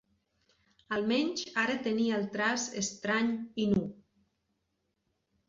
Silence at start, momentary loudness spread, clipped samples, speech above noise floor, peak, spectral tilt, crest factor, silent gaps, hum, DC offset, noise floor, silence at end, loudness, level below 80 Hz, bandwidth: 0.9 s; 4 LU; under 0.1%; 50 dB; -16 dBFS; -4 dB/octave; 18 dB; none; none; under 0.1%; -80 dBFS; 1.55 s; -31 LUFS; -66 dBFS; 7.8 kHz